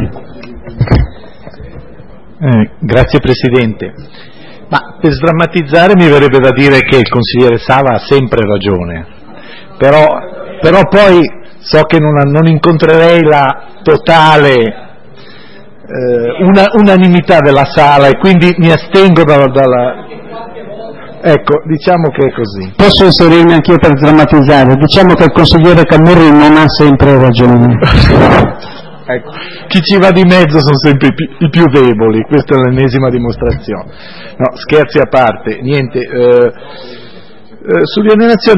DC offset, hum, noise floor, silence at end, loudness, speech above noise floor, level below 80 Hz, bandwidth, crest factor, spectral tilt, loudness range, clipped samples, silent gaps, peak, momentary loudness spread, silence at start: under 0.1%; none; -35 dBFS; 0 s; -7 LUFS; 29 dB; -26 dBFS; 11 kHz; 8 dB; -7.5 dB/octave; 7 LU; 3%; none; 0 dBFS; 13 LU; 0 s